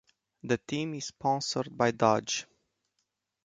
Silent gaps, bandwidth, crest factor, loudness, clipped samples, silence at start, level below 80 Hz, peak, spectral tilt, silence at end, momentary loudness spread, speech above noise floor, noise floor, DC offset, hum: none; 9.6 kHz; 24 dB; -30 LUFS; under 0.1%; 0.45 s; -68 dBFS; -8 dBFS; -4 dB/octave; 1 s; 8 LU; 52 dB; -81 dBFS; under 0.1%; none